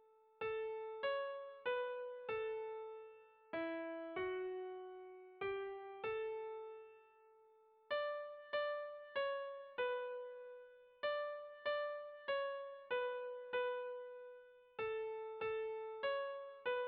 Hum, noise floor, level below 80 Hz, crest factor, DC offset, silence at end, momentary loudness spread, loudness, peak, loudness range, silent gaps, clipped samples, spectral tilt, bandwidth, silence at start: none; -69 dBFS; -82 dBFS; 14 dB; under 0.1%; 0 s; 13 LU; -44 LUFS; -30 dBFS; 3 LU; none; under 0.1%; -0.5 dB/octave; 5 kHz; 0 s